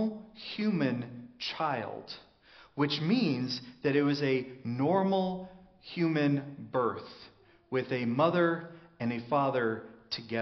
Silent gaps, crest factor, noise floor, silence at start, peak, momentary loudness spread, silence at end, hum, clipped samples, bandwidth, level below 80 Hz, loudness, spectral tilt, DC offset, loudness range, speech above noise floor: none; 18 dB; -57 dBFS; 0 s; -14 dBFS; 16 LU; 0 s; none; under 0.1%; 6.4 kHz; -72 dBFS; -31 LUFS; -5 dB/octave; under 0.1%; 3 LU; 26 dB